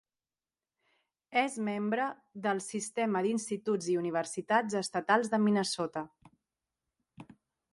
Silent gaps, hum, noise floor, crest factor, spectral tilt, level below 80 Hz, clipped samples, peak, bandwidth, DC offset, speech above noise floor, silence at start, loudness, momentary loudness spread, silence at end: none; none; under -90 dBFS; 22 dB; -4.5 dB/octave; -80 dBFS; under 0.1%; -12 dBFS; 11.5 kHz; under 0.1%; over 59 dB; 1.3 s; -32 LUFS; 8 LU; 0.5 s